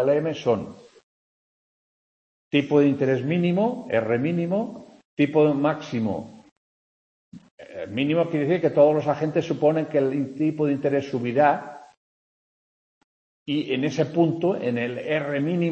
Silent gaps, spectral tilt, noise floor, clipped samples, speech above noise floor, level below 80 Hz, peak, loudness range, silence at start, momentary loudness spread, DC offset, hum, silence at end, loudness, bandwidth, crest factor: 1.03-2.51 s, 5.05-5.17 s, 6.51-7.32 s, 7.51-7.58 s, 11.97-13.46 s; -7.5 dB/octave; under -90 dBFS; under 0.1%; over 68 dB; -68 dBFS; -6 dBFS; 5 LU; 0 s; 10 LU; under 0.1%; none; 0 s; -23 LUFS; 8 kHz; 18 dB